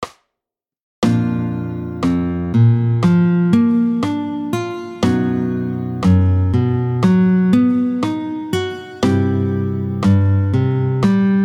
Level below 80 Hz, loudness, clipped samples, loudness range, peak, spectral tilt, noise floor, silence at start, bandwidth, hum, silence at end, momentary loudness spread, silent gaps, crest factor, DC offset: -42 dBFS; -17 LUFS; under 0.1%; 2 LU; 0 dBFS; -8.5 dB/octave; -85 dBFS; 0 s; 11.5 kHz; none; 0 s; 8 LU; 0.82-1.02 s; 14 dB; under 0.1%